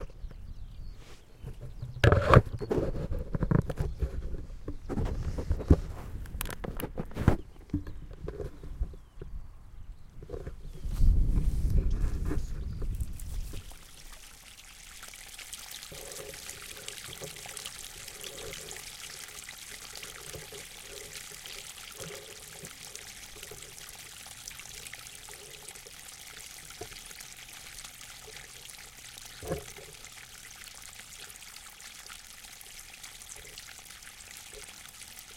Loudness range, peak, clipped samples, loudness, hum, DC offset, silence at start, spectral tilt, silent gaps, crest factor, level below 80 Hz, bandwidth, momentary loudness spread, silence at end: 15 LU; -2 dBFS; under 0.1%; -36 LUFS; none; under 0.1%; 0 s; -5 dB/octave; none; 30 dB; -38 dBFS; 17 kHz; 17 LU; 0 s